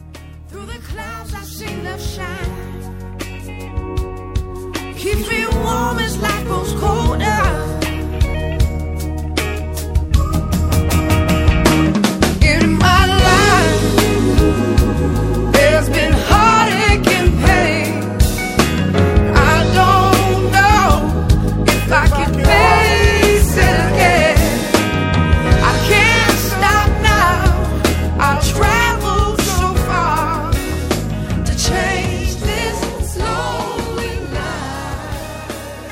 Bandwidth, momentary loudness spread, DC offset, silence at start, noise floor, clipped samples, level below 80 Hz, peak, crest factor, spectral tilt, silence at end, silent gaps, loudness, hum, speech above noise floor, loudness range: 16.5 kHz; 15 LU; under 0.1%; 0 s; -34 dBFS; under 0.1%; -20 dBFS; 0 dBFS; 14 dB; -5 dB/octave; 0 s; none; -14 LUFS; none; 13 dB; 9 LU